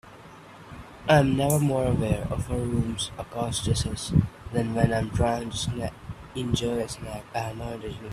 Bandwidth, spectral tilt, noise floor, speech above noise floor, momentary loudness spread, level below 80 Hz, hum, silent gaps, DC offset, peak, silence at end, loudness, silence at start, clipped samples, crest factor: 15 kHz; -5.5 dB/octave; -47 dBFS; 21 dB; 16 LU; -42 dBFS; none; none; under 0.1%; -6 dBFS; 0 s; -27 LUFS; 0.05 s; under 0.1%; 22 dB